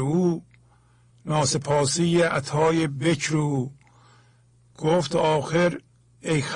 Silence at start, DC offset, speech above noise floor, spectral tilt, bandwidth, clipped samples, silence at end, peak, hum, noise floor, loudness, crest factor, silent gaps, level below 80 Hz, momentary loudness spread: 0 s; under 0.1%; 35 dB; -5 dB/octave; 10.5 kHz; under 0.1%; 0 s; -10 dBFS; none; -58 dBFS; -23 LUFS; 14 dB; none; -56 dBFS; 9 LU